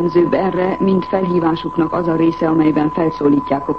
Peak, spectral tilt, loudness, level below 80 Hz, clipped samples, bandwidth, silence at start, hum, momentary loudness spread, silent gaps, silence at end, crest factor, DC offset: -2 dBFS; -9.5 dB/octave; -16 LUFS; -46 dBFS; under 0.1%; 6 kHz; 0 s; none; 3 LU; none; 0 s; 12 dB; 0.4%